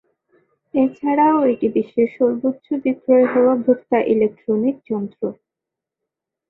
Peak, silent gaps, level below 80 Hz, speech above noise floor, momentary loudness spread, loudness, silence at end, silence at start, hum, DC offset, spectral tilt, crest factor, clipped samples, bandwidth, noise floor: -4 dBFS; none; -62 dBFS; 67 dB; 10 LU; -18 LUFS; 1.15 s; 0.75 s; none; under 0.1%; -10 dB/octave; 16 dB; under 0.1%; 4 kHz; -85 dBFS